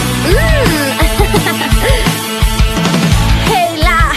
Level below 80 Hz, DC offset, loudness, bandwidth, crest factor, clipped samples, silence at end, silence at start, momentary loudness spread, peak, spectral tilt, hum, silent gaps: -16 dBFS; under 0.1%; -11 LUFS; 14.5 kHz; 10 dB; under 0.1%; 0 s; 0 s; 2 LU; 0 dBFS; -4.5 dB/octave; none; none